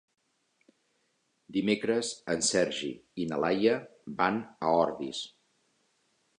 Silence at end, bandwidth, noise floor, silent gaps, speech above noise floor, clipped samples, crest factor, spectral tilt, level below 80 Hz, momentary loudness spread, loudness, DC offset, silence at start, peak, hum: 1.1 s; 11 kHz; -75 dBFS; none; 45 dB; under 0.1%; 22 dB; -3.5 dB/octave; -68 dBFS; 10 LU; -30 LUFS; under 0.1%; 1.5 s; -10 dBFS; none